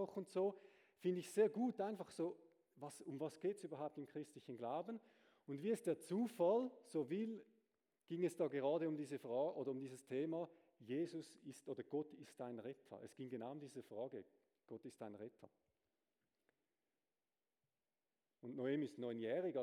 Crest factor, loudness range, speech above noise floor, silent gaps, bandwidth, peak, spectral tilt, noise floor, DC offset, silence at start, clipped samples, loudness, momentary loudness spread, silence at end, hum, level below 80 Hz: 20 dB; 13 LU; over 45 dB; none; 15.5 kHz; -26 dBFS; -6.5 dB/octave; under -90 dBFS; under 0.1%; 0 s; under 0.1%; -45 LUFS; 16 LU; 0 s; none; under -90 dBFS